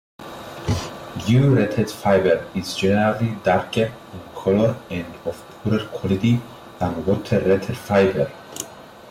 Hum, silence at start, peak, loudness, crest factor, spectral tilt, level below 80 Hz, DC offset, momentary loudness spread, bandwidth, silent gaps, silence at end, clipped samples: none; 0.2 s; -8 dBFS; -21 LUFS; 14 dB; -6.5 dB/octave; -48 dBFS; under 0.1%; 15 LU; 16 kHz; none; 0 s; under 0.1%